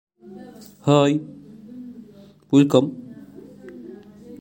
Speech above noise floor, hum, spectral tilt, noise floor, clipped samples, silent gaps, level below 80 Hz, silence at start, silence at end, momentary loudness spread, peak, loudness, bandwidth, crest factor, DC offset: 30 dB; none; -7 dB/octave; -47 dBFS; under 0.1%; none; -66 dBFS; 0.3 s; 0.05 s; 26 LU; -2 dBFS; -19 LUFS; 16.5 kHz; 22 dB; under 0.1%